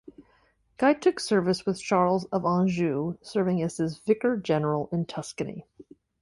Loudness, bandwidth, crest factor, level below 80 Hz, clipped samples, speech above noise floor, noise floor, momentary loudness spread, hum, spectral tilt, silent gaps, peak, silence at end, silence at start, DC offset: -26 LUFS; 11.5 kHz; 16 dB; -62 dBFS; under 0.1%; 39 dB; -65 dBFS; 10 LU; none; -6.5 dB/octave; none; -10 dBFS; 0.4 s; 0.2 s; under 0.1%